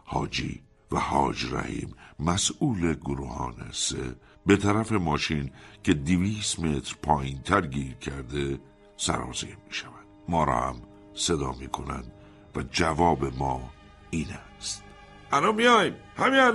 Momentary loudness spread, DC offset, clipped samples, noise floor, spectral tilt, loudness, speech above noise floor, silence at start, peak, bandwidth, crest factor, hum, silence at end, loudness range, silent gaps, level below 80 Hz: 14 LU; under 0.1%; under 0.1%; -49 dBFS; -4.5 dB/octave; -27 LUFS; 22 dB; 0.05 s; -6 dBFS; 11.5 kHz; 22 dB; none; 0 s; 4 LU; none; -44 dBFS